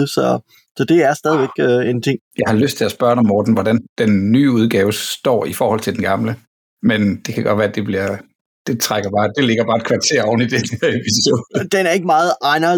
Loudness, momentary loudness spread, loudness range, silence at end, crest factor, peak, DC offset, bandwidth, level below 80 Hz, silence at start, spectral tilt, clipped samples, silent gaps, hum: -16 LUFS; 7 LU; 3 LU; 0 s; 12 dB; -4 dBFS; under 0.1%; 19 kHz; -58 dBFS; 0 s; -5 dB/octave; under 0.1%; 0.71-0.75 s, 2.21-2.31 s, 3.89-3.96 s, 6.47-6.77 s, 8.35-8.65 s; none